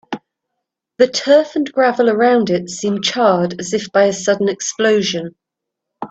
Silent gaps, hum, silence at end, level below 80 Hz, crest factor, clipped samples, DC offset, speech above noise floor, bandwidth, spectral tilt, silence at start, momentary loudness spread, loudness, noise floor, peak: none; none; 0.05 s; -62 dBFS; 16 dB; under 0.1%; under 0.1%; 65 dB; 8.4 kHz; -4 dB/octave; 0.1 s; 9 LU; -15 LUFS; -80 dBFS; 0 dBFS